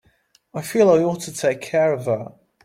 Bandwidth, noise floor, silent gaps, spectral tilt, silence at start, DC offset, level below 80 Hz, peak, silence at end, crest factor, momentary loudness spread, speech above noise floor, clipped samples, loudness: 16.5 kHz; -60 dBFS; none; -5.5 dB/octave; 0.55 s; under 0.1%; -62 dBFS; -4 dBFS; 0.35 s; 18 dB; 16 LU; 41 dB; under 0.1%; -20 LUFS